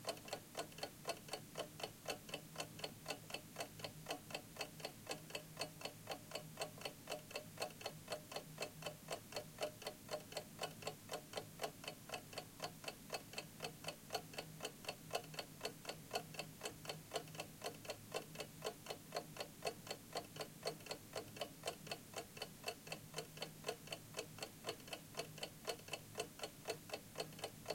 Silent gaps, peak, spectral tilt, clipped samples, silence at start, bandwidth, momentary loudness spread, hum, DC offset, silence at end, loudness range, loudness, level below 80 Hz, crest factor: none; -26 dBFS; -2.5 dB/octave; under 0.1%; 0 s; 17 kHz; 4 LU; none; under 0.1%; 0 s; 1 LU; -49 LUFS; -74 dBFS; 24 dB